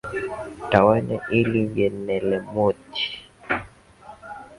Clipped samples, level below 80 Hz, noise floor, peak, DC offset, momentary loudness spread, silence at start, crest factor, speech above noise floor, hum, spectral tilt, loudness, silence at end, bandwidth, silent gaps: under 0.1%; -50 dBFS; -46 dBFS; 0 dBFS; under 0.1%; 16 LU; 0.05 s; 24 dB; 25 dB; none; -7 dB/octave; -23 LUFS; 0.05 s; 11.5 kHz; none